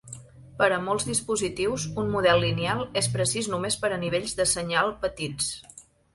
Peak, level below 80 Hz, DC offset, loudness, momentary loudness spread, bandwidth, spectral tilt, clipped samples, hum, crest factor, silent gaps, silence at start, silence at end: -8 dBFS; -52 dBFS; under 0.1%; -26 LUFS; 7 LU; 12 kHz; -3.5 dB/octave; under 0.1%; none; 20 dB; none; 0.05 s; 0.35 s